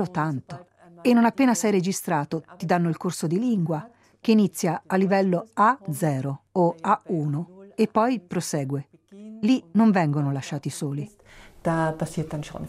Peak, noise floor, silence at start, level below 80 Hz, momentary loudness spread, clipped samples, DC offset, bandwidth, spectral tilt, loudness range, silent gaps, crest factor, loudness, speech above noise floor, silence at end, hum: -6 dBFS; -43 dBFS; 0 s; -60 dBFS; 12 LU; under 0.1%; under 0.1%; 15.5 kHz; -6 dB/octave; 2 LU; none; 18 dB; -24 LUFS; 20 dB; 0 s; none